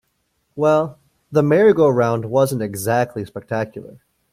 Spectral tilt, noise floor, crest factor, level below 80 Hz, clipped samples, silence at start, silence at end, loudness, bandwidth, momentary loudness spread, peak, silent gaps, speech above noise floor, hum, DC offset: -6.5 dB/octave; -69 dBFS; 16 dB; -58 dBFS; under 0.1%; 0.55 s; 0.4 s; -18 LUFS; 16 kHz; 15 LU; -4 dBFS; none; 51 dB; none; under 0.1%